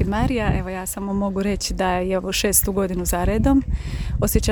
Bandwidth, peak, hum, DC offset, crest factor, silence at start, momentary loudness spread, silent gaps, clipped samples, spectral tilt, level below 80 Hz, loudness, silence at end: over 20 kHz; -2 dBFS; none; under 0.1%; 18 dB; 0 s; 9 LU; none; under 0.1%; -4.5 dB/octave; -28 dBFS; -21 LUFS; 0 s